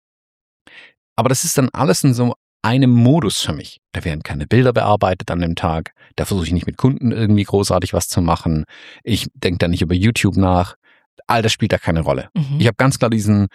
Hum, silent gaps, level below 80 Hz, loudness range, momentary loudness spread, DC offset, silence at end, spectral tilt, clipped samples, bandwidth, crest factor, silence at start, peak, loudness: none; 0.98-1.16 s, 2.36-2.60 s, 10.76-10.82 s, 11.06-11.17 s; -38 dBFS; 2 LU; 10 LU; under 0.1%; 0.05 s; -5.5 dB/octave; under 0.1%; 15.5 kHz; 16 dB; 0.75 s; -2 dBFS; -17 LUFS